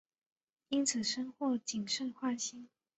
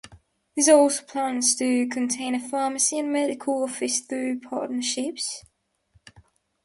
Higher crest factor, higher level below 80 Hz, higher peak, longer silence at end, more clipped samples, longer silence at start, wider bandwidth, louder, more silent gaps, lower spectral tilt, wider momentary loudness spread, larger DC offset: about the same, 20 dB vs 20 dB; second, -80 dBFS vs -68 dBFS; second, -18 dBFS vs -4 dBFS; second, 0.3 s vs 1.25 s; neither; first, 0.7 s vs 0.05 s; second, 8.2 kHz vs 11.5 kHz; second, -36 LUFS vs -24 LUFS; neither; about the same, -2 dB/octave vs -1.5 dB/octave; second, 6 LU vs 12 LU; neither